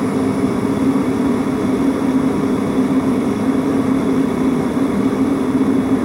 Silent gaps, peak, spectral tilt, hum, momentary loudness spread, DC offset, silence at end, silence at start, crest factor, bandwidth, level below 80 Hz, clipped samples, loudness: none; -4 dBFS; -7 dB/octave; none; 2 LU; under 0.1%; 0 s; 0 s; 12 dB; 15 kHz; -42 dBFS; under 0.1%; -17 LUFS